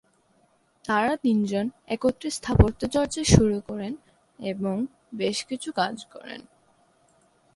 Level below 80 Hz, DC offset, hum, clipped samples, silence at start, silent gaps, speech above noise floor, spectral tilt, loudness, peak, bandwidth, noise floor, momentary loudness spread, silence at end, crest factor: -38 dBFS; under 0.1%; none; under 0.1%; 0.85 s; none; 40 dB; -5.5 dB/octave; -25 LUFS; 0 dBFS; 11.5 kHz; -65 dBFS; 20 LU; 1.15 s; 26 dB